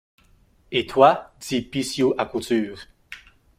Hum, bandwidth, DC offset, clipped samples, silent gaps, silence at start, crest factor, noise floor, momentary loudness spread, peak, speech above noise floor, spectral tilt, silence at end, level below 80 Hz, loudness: none; 16 kHz; under 0.1%; under 0.1%; none; 0.7 s; 22 dB; -58 dBFS; 25 LU; -2 dBFS; 36 dB; -4.5 dB/octave; 0.4 s; -56 dBFS; -22 LUFS